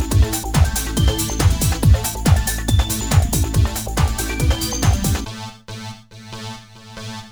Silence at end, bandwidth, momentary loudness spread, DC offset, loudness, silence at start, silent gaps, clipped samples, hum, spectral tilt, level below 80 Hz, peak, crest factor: 0 s; over 20 kHz; 16 LU; under 0.1%; -18 LUFS; 0 s; none; under 0.1%; none; -4.5 dB/octave; -22 dBFS; -2 dBFS; 16 dB